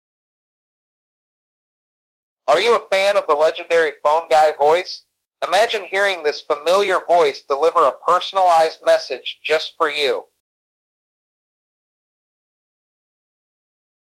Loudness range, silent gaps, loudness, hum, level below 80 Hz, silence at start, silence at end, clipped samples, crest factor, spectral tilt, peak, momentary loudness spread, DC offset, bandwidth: 8 LU; 5.27-5.31 s; -17 LUFS; none; -70 dBFS; 2.45 s; 3.9 s; under 0.1%; 16 dB; -2 dB/octave; -4 dBFS; 7 LU; under 0.1%; 15 kHz